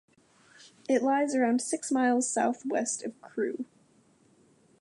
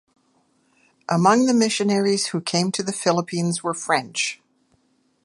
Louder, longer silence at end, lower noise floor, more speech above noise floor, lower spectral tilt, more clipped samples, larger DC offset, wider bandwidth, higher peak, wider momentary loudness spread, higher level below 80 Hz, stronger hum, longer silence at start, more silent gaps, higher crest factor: second, -29 LUFS vs -21 LUFS; first, 1.15 s vs 0.9 s; about the same, -64 dBFS vs -65 dBFS; second, 36 dB vs 44 dB; about the same, -3 dB/octave vs -4 dB/octave; neither; neither; about the same, 11.5 kHz vs 11.5 kHz; second, -14 dBFS vs -2 dBFS; first, 12 LU vs 8 LU; second, -84 dBFS vs -72 dBFS; neither; second, 0.9 s vs 1.1 s; neither; about the same, 16 dB vs 20 dB